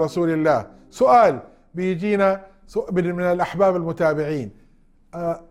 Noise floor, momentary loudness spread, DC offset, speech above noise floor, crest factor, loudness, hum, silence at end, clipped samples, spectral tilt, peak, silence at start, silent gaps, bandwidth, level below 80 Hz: -54 dBFS; 14 LU; under 0.1%; 34 dB; 16 dB; -20 LUFS; none; 0.1 s; under 0.1%; -7.5 dB/octave; -4 dBFS; 0 s; none; 13.5 kHz; -52 dBFS